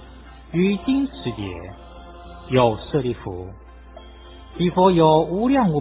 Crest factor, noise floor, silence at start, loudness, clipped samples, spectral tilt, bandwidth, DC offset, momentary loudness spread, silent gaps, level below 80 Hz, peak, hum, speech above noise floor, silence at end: 18 dB; -42 dBFS; 0 s; -20 LUFS; under 0.1%; -11.5 dB/octave; 4 kHz; under 0.1%; 24 LU; none; -42 dBFS; -2 dBFS; none; 22 dB; 0 s